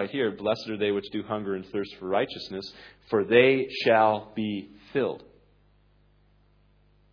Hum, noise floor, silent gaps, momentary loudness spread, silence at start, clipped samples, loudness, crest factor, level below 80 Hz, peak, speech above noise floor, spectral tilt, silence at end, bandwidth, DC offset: 50 Hz at -60 dBFS; -62 dBFS; none; 15 LU; 0 s; under 0.1%; -26 LUFS; 22 dB; -64 dBFS; -6 dBFS; 35 dB; -6.5 dB/octave; 1.95 s; 5.4 kHz; under 0.1%